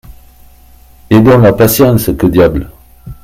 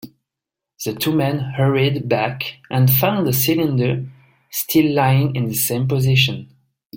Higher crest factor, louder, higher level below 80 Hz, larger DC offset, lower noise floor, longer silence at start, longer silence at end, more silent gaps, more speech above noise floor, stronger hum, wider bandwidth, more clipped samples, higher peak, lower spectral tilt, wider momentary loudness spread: second, 10 dB vs 16 dB; first, -8 LUFS vs -18 LUFS; first, -30 dBFS vs -52 dBFS; neither; second, -39 dBFS vs -85 dBFS; about the same, 0.1 s vs 0.05 s; about the same, 0.1 s vs 0 s; second, none vs 6.85-6.90 s; second, 32 dB vs 67 dB; neither; about the same, 16.5 kHz vs 17 kHz; first, 0.6% vs under 0.1%; about the same, 0 dBFS vs -2 dBFS; about the same, -6.5 dB/octave vs -5.5 dB/octave; second, 7 LU vs 12 LU